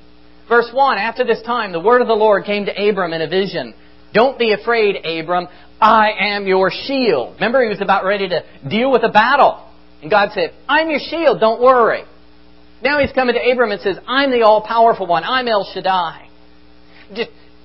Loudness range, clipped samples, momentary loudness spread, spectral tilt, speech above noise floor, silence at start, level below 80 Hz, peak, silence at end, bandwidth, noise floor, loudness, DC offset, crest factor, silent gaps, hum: 2 LU; under 0.1%; 10 LU; -2 dB/octave; 32 dB; 0.5 s; -50 dBFS; 0 dBFS; 0.4 s; 5.8 kHz; -47 dBFS; -15 LUFS; 0.7%; 16 dB; none; none